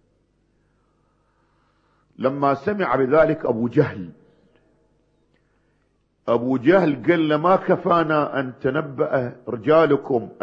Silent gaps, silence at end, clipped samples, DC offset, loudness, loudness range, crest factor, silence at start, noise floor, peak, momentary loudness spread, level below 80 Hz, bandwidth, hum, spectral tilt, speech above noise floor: none; 0 s; under 0.1%; under 0.1%; -20 LUFS; 6 LU; 18 dB; 2.2 s; -66 dBFS; -4 dBFS; 8 LU; -58 dBFS; 6.6 kHz; 50 Hz at -55 dBFS; -9 dB/octave; 46 dB